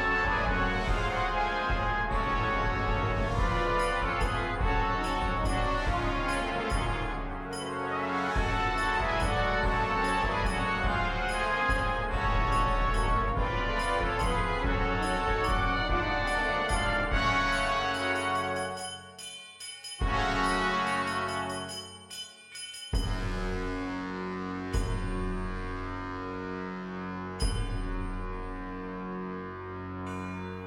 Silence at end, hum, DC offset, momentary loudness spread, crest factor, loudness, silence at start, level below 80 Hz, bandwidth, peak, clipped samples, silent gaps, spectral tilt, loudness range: 0 s; none; under 0.1%; 11 LU; 14 dB; -30 LUFS; 0 s; -36 dBFS; 12.5 kHz; -14 dBFS; under 0.1%; none; -5 dB/octave; 7 LU